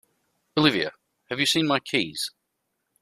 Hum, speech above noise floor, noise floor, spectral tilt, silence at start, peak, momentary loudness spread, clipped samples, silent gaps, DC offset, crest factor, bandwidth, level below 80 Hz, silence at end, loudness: none; 54 dB; -78 dBFS; -3.5 dB/octave; 0.55 s; -4 dBFS; 11 LU; under 0.1%; none; under 0.1%; 22 dB; 15 kHz; -64 dBFS; 0.75 s; -24 LUFS